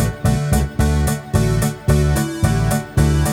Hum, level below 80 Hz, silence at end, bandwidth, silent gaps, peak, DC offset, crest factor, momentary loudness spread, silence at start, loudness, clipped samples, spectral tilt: none; -22 dBFS; 0 s; 16.5 kHz; none; -2 dBFS; under 0.1%; 14 dB; 3 LU; 0 s; -18 LUFS; under 0.1%; -6 dB/octave